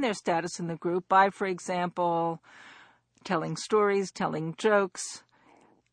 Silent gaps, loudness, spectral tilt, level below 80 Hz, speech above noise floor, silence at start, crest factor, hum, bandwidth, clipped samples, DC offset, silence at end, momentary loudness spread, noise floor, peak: none; -28 LUFS; -4.5 dB/octave; -74 dBFS; 33 dB; 0 s; 20 dB; none; 10 kHz; under 0.1%; under 0.1%; 0.75 s; 12 LU; -61 dBFS; -10 dBFS